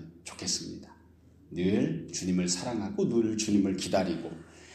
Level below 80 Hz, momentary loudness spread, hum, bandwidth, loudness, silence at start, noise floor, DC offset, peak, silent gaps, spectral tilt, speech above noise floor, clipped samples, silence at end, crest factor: -62 dBFS; 15 LU; none; 14 kHz; -30 LUFS; 0 s; -57 dBFS; under 0.1%; -14 dBFS; none; -4.5 dB/octave; 28 dB; under 0.1%; 0 s; 16 dB